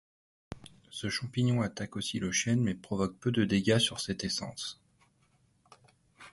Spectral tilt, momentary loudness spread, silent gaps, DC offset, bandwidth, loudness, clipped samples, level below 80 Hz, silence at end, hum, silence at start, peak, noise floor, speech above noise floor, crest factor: -4.5 dB/octave; 16 LU; none; under 0.1%; 11.5 kHz; -31 LUFS; under 0.1%; -58 dBFS; 0.05 s; none; 0.5 s; -12 dBFS; -69 dBFS; 38 dB; 20 dB